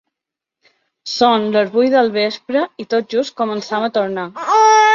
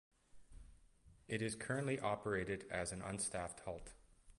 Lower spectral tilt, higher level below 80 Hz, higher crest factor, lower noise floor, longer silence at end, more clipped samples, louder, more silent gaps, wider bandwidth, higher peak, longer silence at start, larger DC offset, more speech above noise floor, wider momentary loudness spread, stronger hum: about the same, -3.5 dB/octave vs -4.5 dB/octave; about the same, -66 dBFS vs -64 dBFS; about the same, 14 dB vs 18 dB; first, -84 dBFS vs -67 dBFS; about the same, 0 s vs 0.05 s; neither; first, -16 LUFS vs -43 LUFS; neither; second, 7.6 kHz vs 11.5 kHz; first, -2 dBFS vs -26 dBFS; first, 1.05 s vs 0.35 s; neither; first, 68 dB vs 25 dB; about the same, 9 LU vs 10 LU; neither